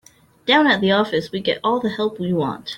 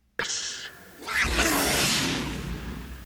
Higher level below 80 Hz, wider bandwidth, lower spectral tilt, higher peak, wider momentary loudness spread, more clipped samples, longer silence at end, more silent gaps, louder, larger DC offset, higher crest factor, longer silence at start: second, -58 dBFS vs -40 dBFS; second, 16.5 kHz vs over 20 kHz; first, -6 dB/octave vs -2.5 dB/octave; first, -2 dBFS vs -12 dBFS; second, 8 LU vs 16 LU; neither; about the same, 0 s vs 0 s; neither; first, -19 LUFS vs -25 LUFS; neither; about the same, 18 dB vs 16 dB; first, 0.45 s vs 0.2 s